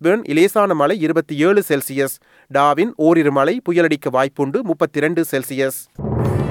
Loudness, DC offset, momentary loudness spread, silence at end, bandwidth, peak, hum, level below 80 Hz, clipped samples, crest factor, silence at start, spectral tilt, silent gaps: -17 LUFS; under 0.1%; 7 LU; 0 s; 18 kHz; -2 dBFS; none; -46 dBFS; under 0.1%; 14 dB; 0 s; -6 dB/octave; none